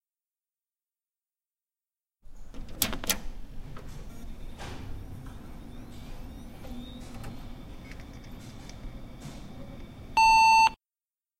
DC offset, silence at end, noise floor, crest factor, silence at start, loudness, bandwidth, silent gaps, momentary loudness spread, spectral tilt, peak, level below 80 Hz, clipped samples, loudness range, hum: under 0.1%; 0.65 s; under -90 dBFS; 26 dB; 2.25 s; -23 LUFS; 16 kHz; none; 26 LU; -2 dB/octave; -6 dBFS; -44 dBFS; under 0.1%; 19 LU; none